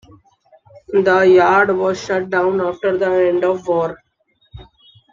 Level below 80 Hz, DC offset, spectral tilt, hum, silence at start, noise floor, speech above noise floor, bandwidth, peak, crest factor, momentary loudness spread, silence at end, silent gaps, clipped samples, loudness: -52 dBFS; under 0.1%; -6 dB/octave; none; 0.9 s; -60 dBFS; 46 dB; 7.4 kHz; -2 dBFS; 14 dB; 9 LU; 0.5 s; none; under 0.1%; -16 LUFS